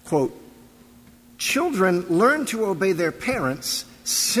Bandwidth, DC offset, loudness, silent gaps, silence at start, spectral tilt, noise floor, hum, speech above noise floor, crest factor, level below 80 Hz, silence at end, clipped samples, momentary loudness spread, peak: 16 kHz; under 0.1%; -22 LUFS; none; 0.05 s; -3.5 dB/octave; -50 dBFS; none; 28 dB; 16 dB; -56 dBFS; 0 s; under 0.1%; 7 LU; -6 dBFS